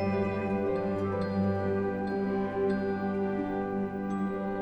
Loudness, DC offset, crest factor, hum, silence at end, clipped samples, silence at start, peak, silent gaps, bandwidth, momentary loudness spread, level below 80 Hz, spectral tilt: -31 LUFS; under 0.1%; 12 dB; none; 0 s; under 0.1%; 0 s; -18 dBFS; none; 8.4 kHz; 3 LU; -56 dBFS; -9 dB/octave